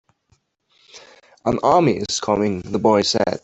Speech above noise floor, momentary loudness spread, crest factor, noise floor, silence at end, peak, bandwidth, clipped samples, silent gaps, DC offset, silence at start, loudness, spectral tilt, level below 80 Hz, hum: 46 dB; 7 LU; 18 dB; -64 dBFS; 0.05 s; -2 dBFS; 8.4 kHz; under 0.1%; none; under 0.1%; 0.95 s; -19 LUFS; -4.5 dB/octave; -52 dBFS; none